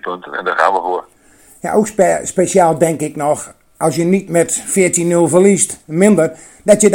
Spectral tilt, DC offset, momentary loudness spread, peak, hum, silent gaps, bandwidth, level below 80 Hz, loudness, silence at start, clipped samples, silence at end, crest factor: -5 dB/octave; under 0.1%; 10 LU; 0 dBFS; none; none; 17.5 kHz; -54 dBFS; -14 LUFS; 0.05 s; 0.2%; 0 s; 14 dB